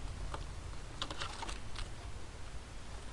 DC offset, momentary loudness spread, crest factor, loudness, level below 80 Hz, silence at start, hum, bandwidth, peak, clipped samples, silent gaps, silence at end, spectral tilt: under 0.1%; 8 LU; 22 dB; -46 LUFS; -48 dBFS; 0 s; none; 11.5 kHz; -20 dBFS; under 0.1%; none; 0 s; -3.5 dB/octave